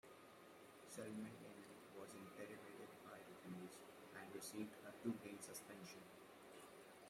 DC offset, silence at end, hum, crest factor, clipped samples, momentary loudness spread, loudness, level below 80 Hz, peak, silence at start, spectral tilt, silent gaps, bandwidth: under 0.1%; 0 s; none; 22 dB; under 0.1%; 11 LU; -56 LUFS; under -90 dBFS; -34 dBFS; 0.05 s; -4.5 dB/octave; none; 16 kHz